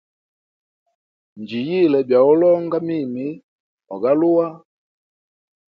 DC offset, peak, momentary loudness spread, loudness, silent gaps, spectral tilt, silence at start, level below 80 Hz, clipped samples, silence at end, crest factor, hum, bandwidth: under 0.1%; -4 dBFS; 16 LU; -18 LUFS; 3.44-3.78 s; -9.5 dB/octave; 1.35 s; -70 dBFS; under 0.1%; 1.2 s; 16 dB; none; 5.4 kHz